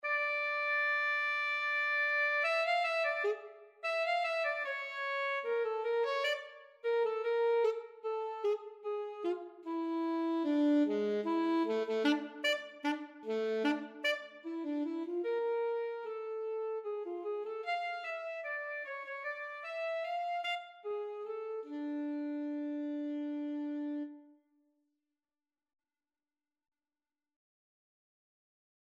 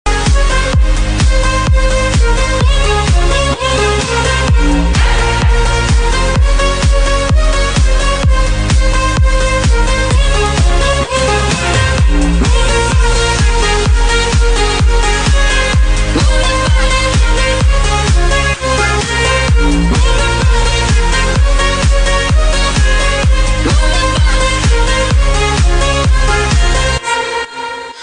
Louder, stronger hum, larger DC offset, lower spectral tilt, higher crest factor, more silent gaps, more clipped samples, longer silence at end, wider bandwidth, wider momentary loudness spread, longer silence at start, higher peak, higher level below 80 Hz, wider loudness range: second, -35 LUFS vs -12 LUFS; neither; neither; about the same, -4 dB/octave vs -4 dB/octave; first, 18 dB vs 10 dB; neither; neither; first, 4.55 s vs 0 s; first, 13.5 kHz vs 10.5 kHz; first, 10 LU vs 1 LU; about the same, 0.05 s vs 0.05 s; second, -18 dBFS vs 0 dBFS; second, under -90 dBFS vs -12 dBFS; first, 8 LU vs 1 LU